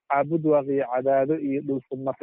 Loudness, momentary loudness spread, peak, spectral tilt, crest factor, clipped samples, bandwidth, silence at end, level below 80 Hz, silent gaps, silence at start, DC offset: -24 LUFS; 7 LU; -10 dBFS; -8.5 dB/octave; 14 dB; under 0.1%; 3.7 kHz; 0.05 s; -68 dBFS; none; 0.1 s; under 0.1%